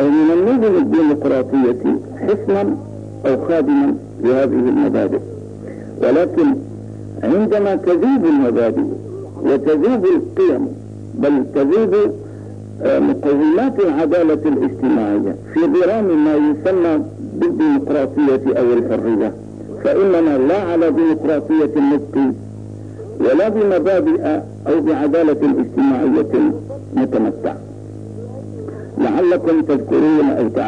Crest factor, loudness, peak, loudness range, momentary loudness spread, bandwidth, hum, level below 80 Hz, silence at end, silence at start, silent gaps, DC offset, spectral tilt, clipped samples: 8 dB; -16 LUFS; -6 dBFS; 2 LU; 16 LU; 7.8 kHz; none; -54 dBFS; 0 s; 0 s; none; 0.3%; -8.5 dB/octave; under 0.1%